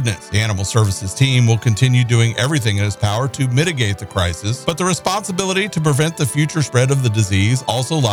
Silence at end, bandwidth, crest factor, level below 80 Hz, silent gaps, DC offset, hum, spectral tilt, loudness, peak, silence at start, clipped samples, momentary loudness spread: 0 s; 15.5 kHz; 14 dB; -44 dBFS; none; 0.1%; none; -5 dB/octave; -17 LUFS; -2 dBFS; 0 s; under 0.1%; 5 LU